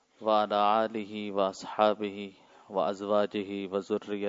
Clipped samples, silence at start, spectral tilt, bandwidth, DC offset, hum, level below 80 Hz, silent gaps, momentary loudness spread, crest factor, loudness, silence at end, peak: under 0.1%; 0.2 s; -5.5 dB/octave; 7.8 kHz; under 0.1%; none; -80 dBFS; none; 11 LU; 20 dB; -30 LUFS; 0 s; -10 dBFS